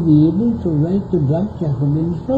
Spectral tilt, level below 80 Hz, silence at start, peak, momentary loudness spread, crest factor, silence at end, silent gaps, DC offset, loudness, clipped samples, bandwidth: -11.5 dB/octave; -40 dBFS; 0 s; -2 dBFS; 7 LU; 14 dB; 0 s; none; under 0.1%; -17 LUFS; under 0.1%; 4.8 kHz